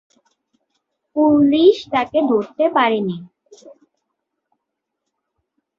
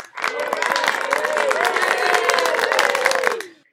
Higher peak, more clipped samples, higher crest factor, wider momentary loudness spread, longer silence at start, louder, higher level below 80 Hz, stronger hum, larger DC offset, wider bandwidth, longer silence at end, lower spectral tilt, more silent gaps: about the same, -2 dBFS vs 0 dBFS; neither; about the same, 18 dB vs 20 dB; first, 12 LU vs 6 LU; first, 1.15 s vs 0 s; first, -16 LUFS vs -19 LUFS; first, -62 dBFS vs -72 dBFS; neither; neither; second, 7 kHz vs 17 kHz; first, 2.1 s vs 0.2 s; first, -7 dB/octave vs 0 dB/octave; neither